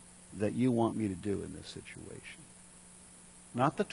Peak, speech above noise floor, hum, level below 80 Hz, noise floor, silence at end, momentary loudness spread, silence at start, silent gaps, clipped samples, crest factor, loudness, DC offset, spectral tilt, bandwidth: -16 dBFS; 22 dB; none; -64 dBFS; -56 dBFS; 0 s; 23 LU; 0 s; none; under 0.1%; 20 dB; -34 LUFS; under 0.1%; -6.5 dB/octave; 11 kHz